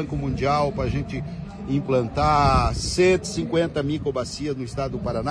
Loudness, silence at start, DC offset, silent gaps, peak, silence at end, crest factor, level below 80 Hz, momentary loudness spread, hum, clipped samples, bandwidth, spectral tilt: -23 LUFS; 0 s; under 0.1%; none; -8 dBFS; 0 s; 16 dB; -36 dBFS; 9 LU; none; under 0.1%; 11 kHz; -6 dB/octave